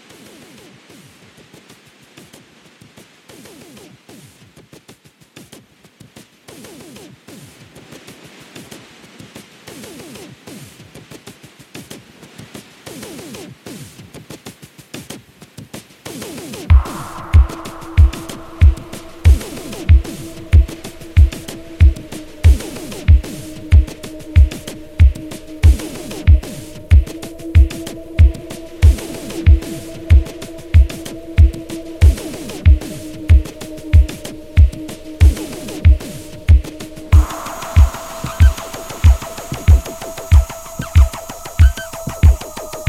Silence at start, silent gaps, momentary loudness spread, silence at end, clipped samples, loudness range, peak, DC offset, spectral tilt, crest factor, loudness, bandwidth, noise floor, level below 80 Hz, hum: 11.75 s; none; 22 LU; 0.05 s; under 0.1%; 20 LU; 0 dBFS; under 0.1%; -6 dB/octave; 16 dB; -15 LUFS; 14.5 kHz; -46 dBFS; -18 dBFS; none